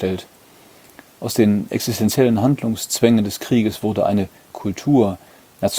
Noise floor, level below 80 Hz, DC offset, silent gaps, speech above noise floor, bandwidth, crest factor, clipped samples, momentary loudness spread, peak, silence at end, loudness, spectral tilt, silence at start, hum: -48 dBFS; -54 dBFS; under 0.1%; none; 30 dB; over 20 kHz; 18 dB; under 0.1%; 12 LU; 0 dBFS; 0 s; -19 LUFS; -5.5 dB/octave; 0 s; none